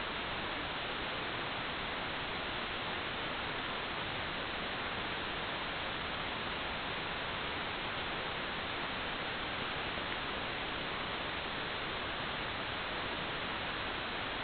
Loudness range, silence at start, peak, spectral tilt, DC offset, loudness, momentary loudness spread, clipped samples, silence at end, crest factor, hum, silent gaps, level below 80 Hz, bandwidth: 0 LU; 0 s; -22 dBFS; -1 dB/octave; under 0.1%; -37 LUFS; 0 LU; under 0.1%; 0 s; 18 dB; none; none; -56 dBFS; 4.9 kHz